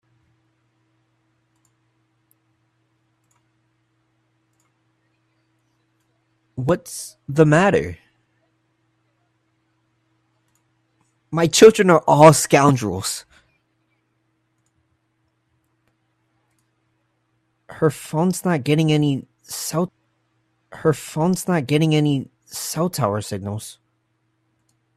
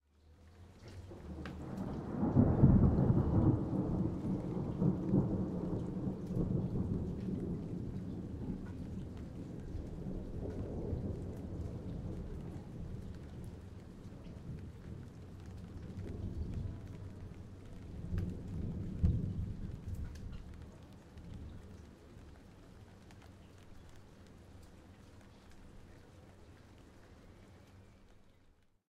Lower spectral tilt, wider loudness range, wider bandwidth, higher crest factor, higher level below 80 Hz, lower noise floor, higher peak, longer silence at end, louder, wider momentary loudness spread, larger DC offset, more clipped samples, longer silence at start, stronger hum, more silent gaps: second, -5.5 dB/octave vs -10 dB/octave; second, 15 LU vs 26 LU; first, 14.5 kHz vs 10.5 kHz; about the same, 22 dB vs 26 dB; second, -58 dBFS vs -48 dBFS; about the same, -69 dBFS vs -67 dBFS; first, 0 dBFS vs -12 dBFS; first, 1.25 s vs 0.4 s; first, -18 LUFS vs -38 LUFS; second, 19 LU vs 26 LU; neither; neither; first, 6.55 s vs 0.25 s; neither; neither